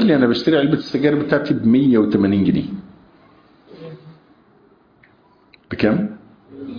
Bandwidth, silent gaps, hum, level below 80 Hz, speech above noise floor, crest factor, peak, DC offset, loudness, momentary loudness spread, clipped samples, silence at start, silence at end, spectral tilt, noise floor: 5.2 kHz; none; none; -52 dBFS; 37 dB; 18 dB; -2 dBFS; under 0.1%; -17 LUFS; 22 LU; under 0.1%; 0 s; 0 s; -8.5 dB/octave; -53 dBFS